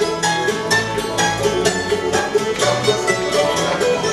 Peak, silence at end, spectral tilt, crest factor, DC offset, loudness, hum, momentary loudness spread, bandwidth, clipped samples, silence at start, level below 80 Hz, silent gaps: -2 dBFS; 0 s; -3 dB/octave; 16 dB; under 0.1%; -17 LUFS; none; 2 LU; 15 kHz; under 0.1%; 0 s; -44 dBFS; none